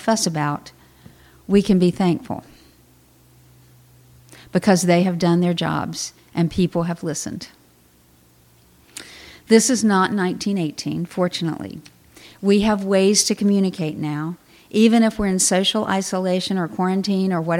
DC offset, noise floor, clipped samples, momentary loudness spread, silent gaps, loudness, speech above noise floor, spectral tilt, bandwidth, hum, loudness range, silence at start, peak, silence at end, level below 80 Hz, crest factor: under 0.1%; -54 dBFS; under 0.1%; 16 LU; none; -19 LUFS; 35 dB; -4.5 dB/octave; 16 kHz; none; 5 LU; 0 s; 0 dBFS; 0 s; -50 dBFS; 20 dB